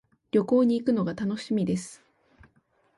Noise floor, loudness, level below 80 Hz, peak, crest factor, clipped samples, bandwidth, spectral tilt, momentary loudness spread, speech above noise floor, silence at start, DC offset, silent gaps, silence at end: -67 dBFS; -26 LUFS; -64 dBFS; -10 dBFS; 16 dB; under 0.1%; 11.5 kHz; -7 dB/octave; 9 LU; 42 dB; 0.35 s; under 0.1%; none; 1.05 s